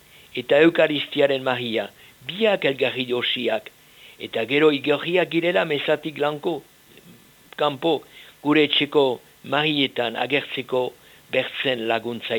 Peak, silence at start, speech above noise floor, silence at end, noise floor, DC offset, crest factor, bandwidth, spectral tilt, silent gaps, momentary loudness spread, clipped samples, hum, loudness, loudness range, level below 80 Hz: -4 dBFS; 0.35 s; 28 dB; 0 s; -50 dBFS; under 0.1%; 18 dB; 19.5 kHz; -5.5 dB/octave; none; 12 LU; under 0.1%; none; -22 LUFS; 3 LU; -68 dBFS